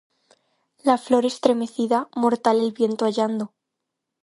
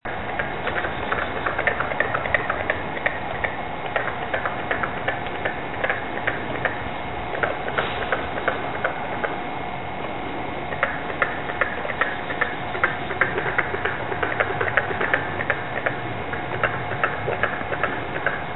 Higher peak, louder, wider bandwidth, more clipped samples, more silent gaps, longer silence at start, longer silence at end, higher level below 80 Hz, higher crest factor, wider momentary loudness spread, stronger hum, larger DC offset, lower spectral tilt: about the same, -2 dBFS vs 0 dBFS; first, -22 LUFS vs -25 LUFS; first, 11.5 kHz vs 4.1 kHz; neither; neither; first, 0.85 s vs 0 s; first, 0.75 s vs 0 s; second, -72 dBFS vs -46 dBFS; about the same, 22 dB vs 24 dB; about the same, 6 LU vs 6 LU; neither; second, under 0.1% vs 2%; second, -5 dB/octave vs -9.5 dB/octave